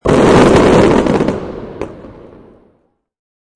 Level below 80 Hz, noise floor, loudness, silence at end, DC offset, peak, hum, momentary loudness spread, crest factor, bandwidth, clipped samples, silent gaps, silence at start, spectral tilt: -30 dBFS; -58 dBFS; -9 LUFS; 1.45 s; under 0.1%; 0 dBFS; none; 19 LU; 12 dB; 11 kHz; under 0.1%; none; 0.05 s; -6.5 dB/octave